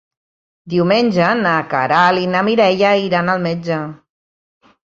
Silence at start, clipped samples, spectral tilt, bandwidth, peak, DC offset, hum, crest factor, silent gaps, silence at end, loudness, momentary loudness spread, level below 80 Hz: 0.65 s; under 0.1%; -6.5 dB/octave; 7.6 kHz; 0 dBFS; under 0.1%; none; 16 dB; none; 0.9 s; -15 LUFS; 8 LU; -58 dBFS